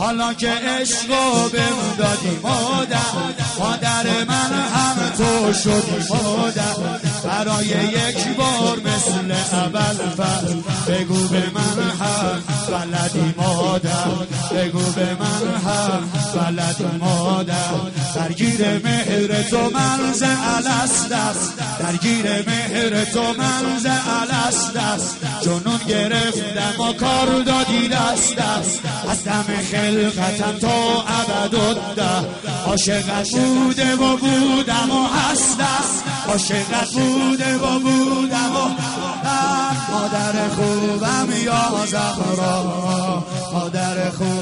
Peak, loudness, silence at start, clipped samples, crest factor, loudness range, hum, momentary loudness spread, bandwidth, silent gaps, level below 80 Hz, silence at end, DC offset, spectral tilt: -4 dBFS; -19 LUFS; 0 s; under 0.1%; 14 dB; 2 LU; none; 5 LU; 11 kHz; none; -48 dBFS; 0 s; under 0.1%; -4 dB/octave